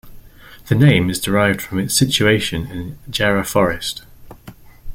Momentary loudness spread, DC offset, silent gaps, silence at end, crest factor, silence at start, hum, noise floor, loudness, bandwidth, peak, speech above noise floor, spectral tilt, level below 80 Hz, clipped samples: 13 LU; under 0.1%; none; 0 s; 16 dB; 0.05 s; none; -41 dBFS; -17 LUFS; 16.5 kHz; -2 dBFS; 24 dB; -4.5 dB/octave; -40 dBFS; under 0.1%